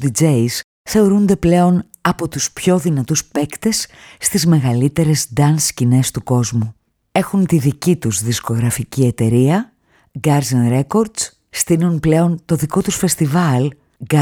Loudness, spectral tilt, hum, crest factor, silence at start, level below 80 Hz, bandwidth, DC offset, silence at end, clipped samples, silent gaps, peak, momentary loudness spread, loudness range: -16 LUFS; -5.5 dB/octave; none; 14 dB; 0 s; -44 dBFS; over 20 kHz; under 0.1%; 0 s; under 0.1%; 0.64-0.85 s; -2 dBFS; 7 LU; 1 LU